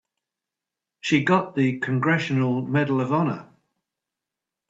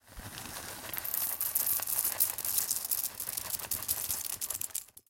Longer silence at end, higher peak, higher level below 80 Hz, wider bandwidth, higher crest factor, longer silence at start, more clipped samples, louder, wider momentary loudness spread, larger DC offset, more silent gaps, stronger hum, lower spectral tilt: first, 1.25 s vs 0.1 s; first, -4 dBFS vs -8 dBFS; second, -68 dBFS vs -62 dBFS; second, 7.8 kHz vs 17.5 kHz; second, 20 dB vs 28 dB; first, 1.05 s vs 0.05 s; neither; first, -23 LUFS vs -31 LUFS; second, 5 LU vs 12 LU; neither; neither; neither; first, -7 dB/octave vs 0 dB/octave